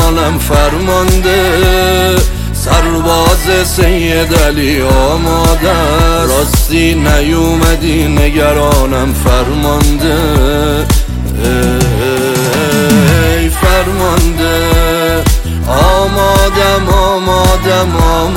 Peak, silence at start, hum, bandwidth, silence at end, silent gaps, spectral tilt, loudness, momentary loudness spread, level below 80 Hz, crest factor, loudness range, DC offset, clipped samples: 0 dBFS; 0 s; none; 17 kHz; 0 s; none; -5 dB/octave; -10 LUFS; 3 LU; -14 dBFS; 8 dB; 1 LU; under 0.1%; under 0.1%